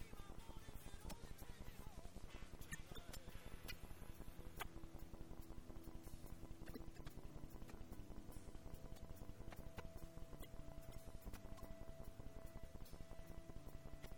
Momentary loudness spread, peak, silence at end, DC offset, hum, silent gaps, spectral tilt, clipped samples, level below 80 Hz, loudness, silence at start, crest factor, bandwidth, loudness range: 4 LU; -34 dBFS; 0 s; under 0.1%; none; none; -5 dB/octave; under 0.1%; -58 dBFS; -58 LUFS; 0 s; 20 dB; 17 kHz; 2 LU